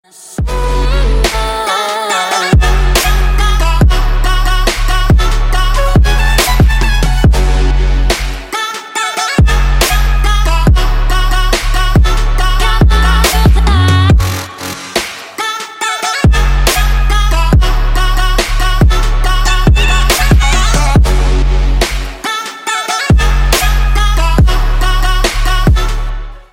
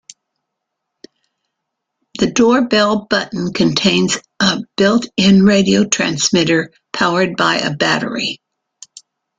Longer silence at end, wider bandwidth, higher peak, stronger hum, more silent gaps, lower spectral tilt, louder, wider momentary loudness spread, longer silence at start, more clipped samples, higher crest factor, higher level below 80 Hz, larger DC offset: second, 0.1 s vs 1.05 s; first, 16.5 kHz vs 9.4 kHz; about the same, 0 dBFS vs 0 dBFS; neither; neither; about the same, -4.5 dB/octave vs -4 dB/octave; about the same, -12 LUFS vs -14 LUFS; about the same, 7 LU vs 8 LU; second, 0.2 s vs 2.15 s; neither; second, 10 dB vs 16 dB; first, -10 dBFS vs -50 dBFS; neither